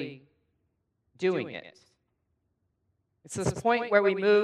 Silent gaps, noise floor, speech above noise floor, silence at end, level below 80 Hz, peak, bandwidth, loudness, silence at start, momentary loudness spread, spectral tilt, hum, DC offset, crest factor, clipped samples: none; -77 dBFS; 51 dB; 0 s; -60 dBFS; -8 dBFS; 11.5 kHz; -27 LUFS; 0 s; 16 LU; -5 dB/octave; none; under 0.1%; 22 dB; under 0.1%